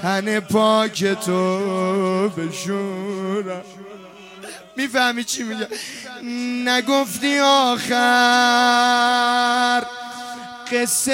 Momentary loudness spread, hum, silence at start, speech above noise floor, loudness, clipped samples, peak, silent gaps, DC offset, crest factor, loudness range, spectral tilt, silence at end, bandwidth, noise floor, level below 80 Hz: 17 LU; none; 0 s; 20 dB; -18 LUFS; under 0.1%; -4 dBFS; none; under 0.1%; 16 dB; 9 LU; -3 dB/octave; 0 s; 16.5 kHz; -39 dBFS; -66 dBFS